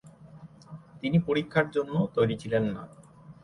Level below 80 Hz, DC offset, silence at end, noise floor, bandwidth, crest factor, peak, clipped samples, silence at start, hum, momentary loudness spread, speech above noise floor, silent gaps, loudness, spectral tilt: -58 dBFS; under 0.1%; 0.1 s; -49 dBFS; 11 kHz; 20 dB; -8 dBFS; under 0.1%; 0.05 s; none; 22 LU; 23 dB; none; -28 LUFS; -8 dB/octave